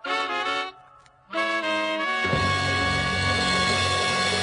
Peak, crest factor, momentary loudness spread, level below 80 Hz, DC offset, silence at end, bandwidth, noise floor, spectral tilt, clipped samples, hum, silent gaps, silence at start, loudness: -10 dBFS; 14 dB; 6 LU; -46 dBFS; under 0.1%; 0 s; 11 kHz; -53 dBFS; -3.5 dB/octave; under 0.1%; none; none; 0.05 s; -23 LUFS